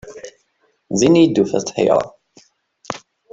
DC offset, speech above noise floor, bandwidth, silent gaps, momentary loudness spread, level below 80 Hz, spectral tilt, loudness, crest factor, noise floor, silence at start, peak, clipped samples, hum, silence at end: under 0.1%; 49 dB; 8 kHz; none; 20 LU; -56 dBFS; -5.5 dB/octave; -16 LUFS; 16 dB; -64 dBFS; 0.05 s; -2 dBFS; under 0.1%; none; 0.35 s